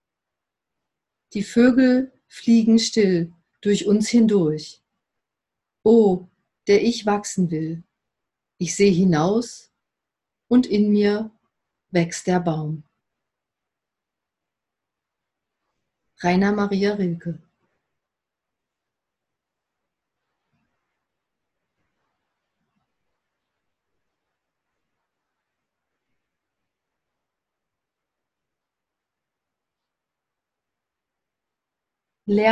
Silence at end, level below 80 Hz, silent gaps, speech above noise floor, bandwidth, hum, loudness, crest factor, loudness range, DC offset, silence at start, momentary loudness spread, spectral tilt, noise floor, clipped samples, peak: 0 s; -60 dBFS; none; 67 dB; 11.5 kHz; none; -20 LUFS; 20 dB; 9 LU; under 0.1%; 1.35 s; 16 LU; -6 dB/octave; -85 dBFS; under 0.1%; -4 dBFS